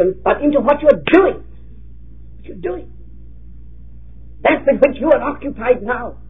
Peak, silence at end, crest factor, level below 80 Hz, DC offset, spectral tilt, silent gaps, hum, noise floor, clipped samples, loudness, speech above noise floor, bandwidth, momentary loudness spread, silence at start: 0 dBFS; 0.05 s; 18 dB; -38 dBFS; 2%; -8.5 dB/octave; none; none; -39 dBFS; under 0.1%; -15 LUFS; 24 dB; 4 kHz; 14 LU; 0 s